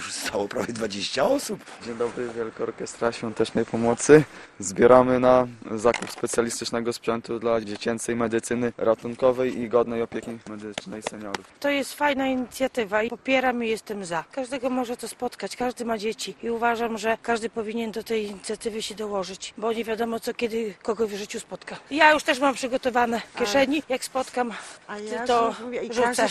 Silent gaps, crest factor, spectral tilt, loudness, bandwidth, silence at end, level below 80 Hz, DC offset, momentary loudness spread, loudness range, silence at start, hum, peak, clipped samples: none; 24 dB; -4 dB/octave; -25 LUFS; 13 kHz; 0 s; -56 dBFS; under 0.1%; 13 LU; 8 LU; 0 s; none; 0 dBFS; under 0.1%